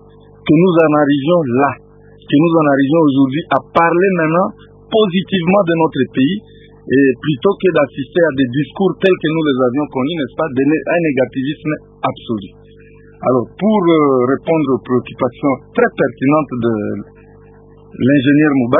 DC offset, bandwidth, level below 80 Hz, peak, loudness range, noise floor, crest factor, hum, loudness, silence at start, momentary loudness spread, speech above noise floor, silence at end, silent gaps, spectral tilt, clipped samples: under 0.1%; 3.9 kHz; -50 dBFS; 0 dBFS; 4 LU; -41 dBFS; 14 dB; none; -14 LUFS; 0.45 s; 9 LU; 28 dB; 0 s; none; -10 dB/octave; under 0.1%